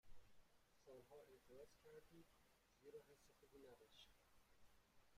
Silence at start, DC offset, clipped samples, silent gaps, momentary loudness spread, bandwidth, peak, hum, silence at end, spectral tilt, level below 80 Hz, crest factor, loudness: 0.05 s; under 0.1%; under 0.1%; none; 3 LU; 15.5 kHz; -50 dBFS; none; 0 s; -4 dB/octave; -80 dBFS; 16 dB; -67 LUFS